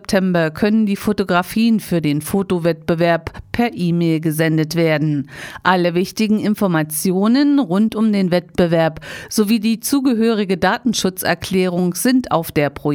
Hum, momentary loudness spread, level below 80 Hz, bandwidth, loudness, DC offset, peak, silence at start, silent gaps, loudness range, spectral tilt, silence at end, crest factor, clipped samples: none; 4 LU; -46 dBFS; over 20 kHz; -17 LUFS; under 0.1%; -2 dBFS; 0.1 s; none; 2 LU; -5.5 dB/octave; 0 s; 14 dB; under 0.1%